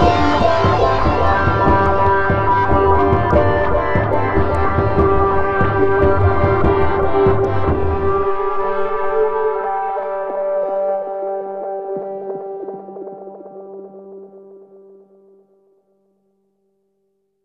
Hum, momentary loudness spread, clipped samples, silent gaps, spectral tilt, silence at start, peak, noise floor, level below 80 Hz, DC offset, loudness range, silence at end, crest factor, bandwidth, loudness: none; 16 LU; under 0.1%; none; -8 dB/octave; 0 s; 0 dBFS; -67 dBFS; -30 dBFS; under 0.1%; 15 LU; 0 s; 16 dB; 7.6 kHz; -16 LUFS